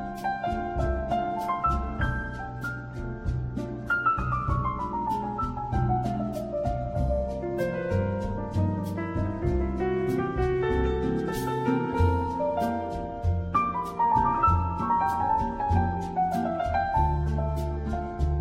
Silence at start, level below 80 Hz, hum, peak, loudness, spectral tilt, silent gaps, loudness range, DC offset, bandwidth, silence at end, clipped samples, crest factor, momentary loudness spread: 0 s; -36 dBFS; none; -12 dBFS; -28 LUFS; -8 dB/octave; none; 4 LU; under 0.1%; 16 kHz; 0 s; under 0.1%; 16 dB; 7 LU